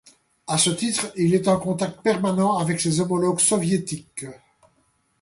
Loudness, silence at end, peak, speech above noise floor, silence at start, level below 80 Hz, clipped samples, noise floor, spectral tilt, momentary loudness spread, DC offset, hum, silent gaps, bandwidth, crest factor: -22 LUFS; 0.85 s; -6 dBFS; 44 dB; 0.5 s; -60 dBFS; under 0.1%; -66 dBFS; -4.5 dB/octave; 13 LU; under 0.1%; none; none; 11.5 kHz; 18 dB